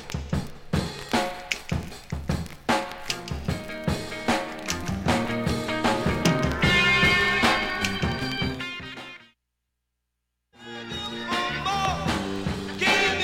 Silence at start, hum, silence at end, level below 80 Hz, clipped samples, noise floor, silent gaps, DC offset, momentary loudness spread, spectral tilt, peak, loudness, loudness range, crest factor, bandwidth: 0 s; 60 Hz at -55 dBFS; 0 s; -40 dBFS; under 0.1%; -80 dBFS; none; under 0.1%; 13 LU; -4 dB/octave; -6 dBFS; -25 LUFS; 10 LU; 22 dB; 17.5 kHz